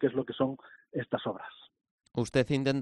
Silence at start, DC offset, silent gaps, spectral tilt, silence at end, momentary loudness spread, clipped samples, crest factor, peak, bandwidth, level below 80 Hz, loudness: 0 s; under 0.1%; 1.91-1.98 s; -6.5 dB/octave; 0 s; 14 LU; under 0.1%; 18 dB; -14 dBFS; 11.5 kHz; -62 dBFS; -32 LUFS